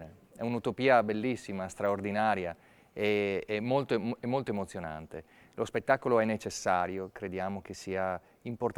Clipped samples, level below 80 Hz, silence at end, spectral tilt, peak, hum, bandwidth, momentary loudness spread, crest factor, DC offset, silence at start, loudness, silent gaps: under 0.1%; -64 dBFS; 0.05 s; -5.5 dB/octave; -10 dBFS; none; over 20 kHz; 14 LU; 22 dB; under 0.1%; 0 s; -32 LUFS; none